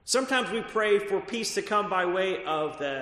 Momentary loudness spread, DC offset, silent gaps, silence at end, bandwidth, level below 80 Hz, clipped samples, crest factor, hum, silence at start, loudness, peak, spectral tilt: 5 LU; under 0.1%; none; 0 s; 13.5 kHz; -64 dBFS; under 0.1%; 16 dB; none; 0.05 s; -27 LUFS; -10 dBFS; -2.5 dB/octave